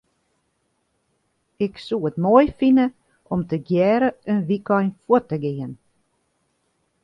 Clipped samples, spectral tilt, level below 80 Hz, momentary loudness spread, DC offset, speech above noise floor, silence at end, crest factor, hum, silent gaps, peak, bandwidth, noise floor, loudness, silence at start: under 0.1%; -9 dB/octave; -54 dBFS; 11 LU; under 0.1%; 51 dB; 1.3 s; 20 dB; none; none; -2 dBFS; 5.8 kHz; -70 dBFS; -21 LUFS; 1.6 s